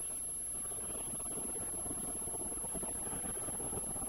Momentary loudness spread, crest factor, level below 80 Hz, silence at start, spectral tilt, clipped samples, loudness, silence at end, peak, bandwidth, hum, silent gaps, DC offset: 1 LU; 14 dB; -56 dBFS; 0 s; -3 dB/octave; under 0.1%; -37 LUFS; 0 s; -26 dBFS; 17 kHz; none; none; under 0.1%